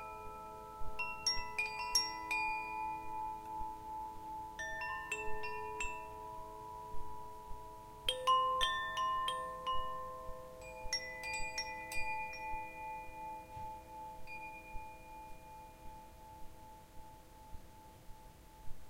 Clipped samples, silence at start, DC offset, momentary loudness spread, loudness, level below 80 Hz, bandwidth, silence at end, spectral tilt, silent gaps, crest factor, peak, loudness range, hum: under 0.1%; 0 s; under 0.1%; 22 LU; -40 LUFS; -56 dBFS; 16 kHz; 0 s; -1.5 dB/octave; none; 22 dB; -18 dBFS; 16 LU; none